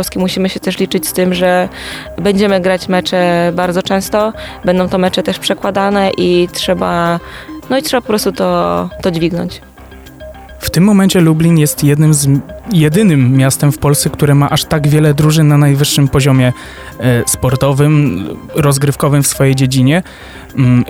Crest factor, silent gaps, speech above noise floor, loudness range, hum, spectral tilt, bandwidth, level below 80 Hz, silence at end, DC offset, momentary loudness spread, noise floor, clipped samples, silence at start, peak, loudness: 10 dB; none; 23 dB; 4 LU; none; -5.5 dB/octave; 17 kHz; -36 dBFS; 0 s; under 0.1%; 10 LU; -34 dBFS; under 0.1%; 0 s; 0 dBFS; -12 LUFS